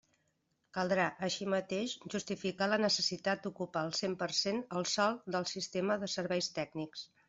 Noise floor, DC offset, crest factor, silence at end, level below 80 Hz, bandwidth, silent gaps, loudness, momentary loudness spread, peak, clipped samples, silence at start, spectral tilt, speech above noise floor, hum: -79 dBFS; under 0.1%; 18 dB; 0.25 s; -76 dBFS; 8 kHz; none; -35 LUFS; 8 LU; -16 dBFS; under 0.1%; 0.75 s; -3.5 dB/octave; 44 dB; none